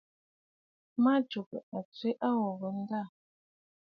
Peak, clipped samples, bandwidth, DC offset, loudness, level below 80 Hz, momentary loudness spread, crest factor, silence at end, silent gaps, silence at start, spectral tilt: -18 dBFS; under 0.1%; 5.6 kHz; under 0.1%; -33 LUFS; -84 dBFS; 14 LU; 18 dB; 0.8 s; 1.46-1.51 s, 1.63-1.72 s, 1.85-1.92 s; 0.95 s; -8.5 dB/octave